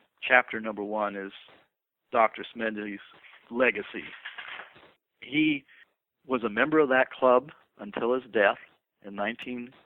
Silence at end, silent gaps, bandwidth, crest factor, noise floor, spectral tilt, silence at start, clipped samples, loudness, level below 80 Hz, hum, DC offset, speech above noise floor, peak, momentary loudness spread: 0.15 s; none; 4.1 kHz; 24 dB; -73 dBFS; -7.5 dB/octave; 0.2 s; under 0.1%; -27 LUFS; -72 dBFS; none; under 0.1%; 46 dB; -4 dBFS; 18 LU